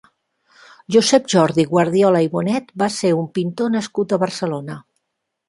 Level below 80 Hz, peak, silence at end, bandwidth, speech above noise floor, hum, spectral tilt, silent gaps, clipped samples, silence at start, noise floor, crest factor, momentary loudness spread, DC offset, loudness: -62 dBFS; -2 dBFS; 0.7 s; 11.5 kHz; 59 dB; none; -5 dB/octave; none; under 0.1%; 0.9 s; -77 dBFS; 18 dB; 10 LU; under 0.1%; -18 LUFS